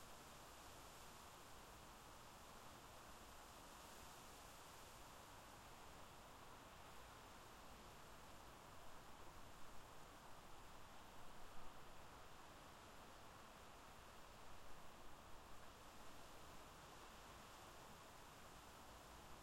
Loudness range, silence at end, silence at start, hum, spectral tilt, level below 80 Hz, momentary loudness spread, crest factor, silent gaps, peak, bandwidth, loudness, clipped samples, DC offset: 1 LU; 0 s; 0 s; none; -3 dB/octave; -70 dBFS; 2 LU; 18 dB; none; -42 dBFS; 16 kHz; -61 LUFS; under 0.1%; under 0.1%